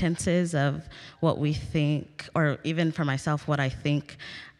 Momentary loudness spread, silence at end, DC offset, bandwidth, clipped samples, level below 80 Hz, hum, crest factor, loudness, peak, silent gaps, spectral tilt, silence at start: 7 LU; 0.1 s; under 0.1%; 11.5 kHz; under 0.1%; -52 dBFS; none; 16 dB; -27 LUFS; -12 dBFS; none; -6 dB/octave; 0 s